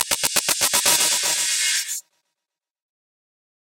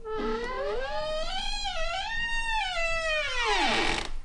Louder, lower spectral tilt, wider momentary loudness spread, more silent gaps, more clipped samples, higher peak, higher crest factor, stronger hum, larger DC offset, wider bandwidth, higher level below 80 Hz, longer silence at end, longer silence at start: first, -18 LUFS vs -29 LUFS; second, 1.5 dB/octave vs -2.5 dB/octave; about the same, 8 LU vs 7 LU; neither; neither; first, -2 dBFS vs -14 dBFS; first, 22 dB vs 16 dB; neither; neither; first, 17.5 kHz vs 11 kHz; second, -60 dBFS vs -36 dBFS; first, 1.6 s vs 0 s; about the same, 0 s vs 0 s